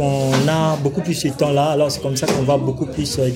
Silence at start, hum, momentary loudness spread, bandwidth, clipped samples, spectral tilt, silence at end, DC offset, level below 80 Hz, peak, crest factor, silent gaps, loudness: 0 s; none; 5 LU; 16.5 kHz; under 0.1%; -5.5 dB/octave; 0 s; under 0.1%; -46 dBFS; -2 dBFS; 16 dB; none; -18 LUFS